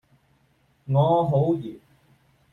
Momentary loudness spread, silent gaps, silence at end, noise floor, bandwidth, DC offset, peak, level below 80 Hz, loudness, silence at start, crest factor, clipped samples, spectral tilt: 18 LU; none; 0.75 s; -64 dBFS; 3.9 kHz; under 0.1%; -8 dBFS; -60 dBFS; -22 LUFS; 0.85 s; 18 dB; under 0.1%; -10.5 dB/octave